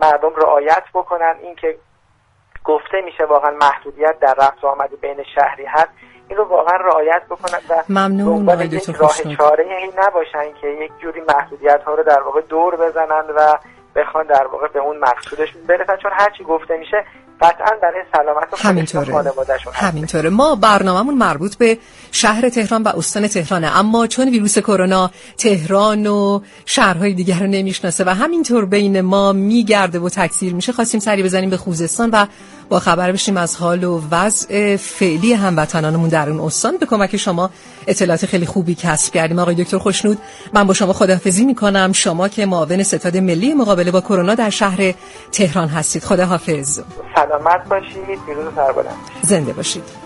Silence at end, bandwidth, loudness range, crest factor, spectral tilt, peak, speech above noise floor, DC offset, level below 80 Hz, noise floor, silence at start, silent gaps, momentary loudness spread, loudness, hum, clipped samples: 0 s; 11.5 kHz; 2 LU; 16 dB; -4.5 dB/octave; 0 dBFS; 41 dB; under 0.1%; -48 dBFS; -56 dBFS; 0 s; none; 7 LU; -15 LUFS; none; under 0.1%